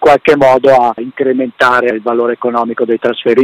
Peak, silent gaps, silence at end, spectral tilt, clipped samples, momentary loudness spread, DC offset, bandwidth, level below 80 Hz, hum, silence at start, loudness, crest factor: 0 dBFS; none; 0 s; -6 dB/octave; under 0.1%; 7 LU; under 0.1%; 13.5 kHz; -48 dBFS; none; 0 s; -11 LUFS; 10 dB